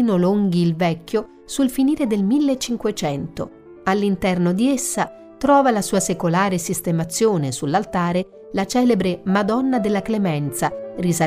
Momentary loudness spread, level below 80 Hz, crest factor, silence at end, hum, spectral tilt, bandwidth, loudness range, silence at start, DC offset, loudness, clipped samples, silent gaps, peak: 8 LU; -50 dBFS; 14 dB; 0 s; none; -5.5 dB/octave; 16 kHz; 2 LU; 0 s; under 0.1%; -20 LUFS; under 0.1%; none; -6 dBFS